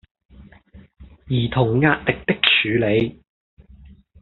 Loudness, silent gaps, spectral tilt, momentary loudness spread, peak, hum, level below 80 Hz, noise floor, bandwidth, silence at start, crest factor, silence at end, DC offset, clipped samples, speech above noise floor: -19 LUFS; none; -3.5 dB/octave; 8 LU; -2 dBFS; none; -46 dBFS; -47 dBFS; 4.4 kHz; 0.4 s; 20 dB; 1.1 s; under 0.1%; under 0.1%; 28 dB